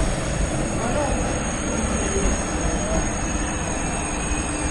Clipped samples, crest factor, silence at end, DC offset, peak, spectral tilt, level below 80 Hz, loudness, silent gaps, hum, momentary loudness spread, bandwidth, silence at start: under 0.1%; 16 dB; 0 s; under 0.1%; -8 dBFS; -4 dB/octave; -28 dBFS; -24 LUFS; none; none; 2 LU; 11.5 kHz; 0 s